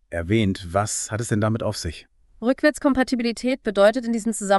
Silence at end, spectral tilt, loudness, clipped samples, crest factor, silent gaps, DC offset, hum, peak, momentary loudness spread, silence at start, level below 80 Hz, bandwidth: 0 s; -5 dB/octave; -22 LUFS; under 0.1%; 18 dB; none; under 0.1%; none; -4 dBFS; 9 LU; 0.1 s; -48 dBFS; 12 kHz